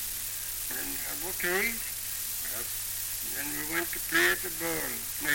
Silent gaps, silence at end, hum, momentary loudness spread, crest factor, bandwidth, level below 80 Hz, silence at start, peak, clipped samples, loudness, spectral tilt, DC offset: none; 0 s; none; 7 LU; 18 dB; 17 kHz; -54 dBFS; 0 s; -14 dBFS; under 0.1%; -30 LUFS; -1 dB/octave; under 0.1%